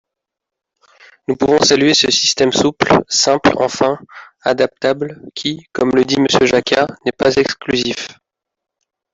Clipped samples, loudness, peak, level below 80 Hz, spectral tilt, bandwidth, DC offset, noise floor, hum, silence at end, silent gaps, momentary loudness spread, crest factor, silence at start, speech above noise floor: under 0.1%; -14 LUFS; -2 dBFS; -50 dBFS; -3 dB/octave; 7.8 kHz; under 0.1%; -83 dBFS; none; 1 s; none; 11 LU; 14 dB; 1.3 s; 68 dB